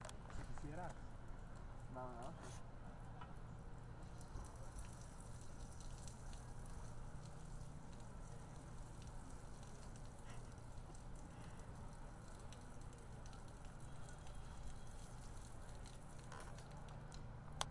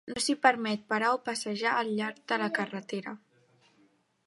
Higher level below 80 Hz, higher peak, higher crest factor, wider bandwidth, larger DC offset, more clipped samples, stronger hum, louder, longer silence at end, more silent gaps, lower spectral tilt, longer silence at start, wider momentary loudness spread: first, -56 dBFS vs -74 dBFS; second, -22 dBFS vs -6 dBFS; about the same, 28 dB vs 24 dB; about the same, 11.5 kHz vs 11.5 kHz; neither; neither; neither; second, -56 LUFS vs -30 LUFS; second, 0 s vs 1.1 s; neither; first, -5 dB/octave vs -3.5 dB/octave; about the same, 0 s vs 0.05 s; second, 4 LU vs 13 LU